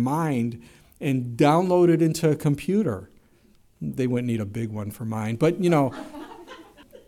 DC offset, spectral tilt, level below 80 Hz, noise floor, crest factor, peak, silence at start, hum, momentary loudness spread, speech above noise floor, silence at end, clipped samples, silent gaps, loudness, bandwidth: under 0.1%; -7 dB/octave; -58 dBFS; -58 dBFS; 16 dB; -8 dBFS; 0 s; none; 17 LU; 35 dB; 0.45 s; under 0.1%; none; -23 LUFS; 16 kHz